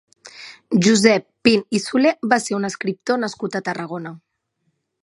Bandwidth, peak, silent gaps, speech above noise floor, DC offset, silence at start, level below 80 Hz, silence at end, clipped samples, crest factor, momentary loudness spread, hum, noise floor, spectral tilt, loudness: 11.5 kHz; 0 dBFS; none; 52 dB; under 0.1%; 0.25 s; -62 dBFS; 0.85 s; under 0.1%; 20 dB; 17 LU; none; -71 dBFS; -4.5 dB/octave; -19 LUFS